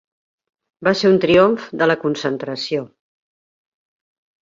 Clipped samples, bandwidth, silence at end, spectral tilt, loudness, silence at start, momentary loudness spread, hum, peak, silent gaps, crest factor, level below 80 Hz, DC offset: under 0.1%; 7.6 kHz; 1.6 s; -6 dB/octave; -17 LUFS; 0.8 s; 11 LU; none; -2 dBFS; none; 18 dB; -56 dBFS; under 0.1%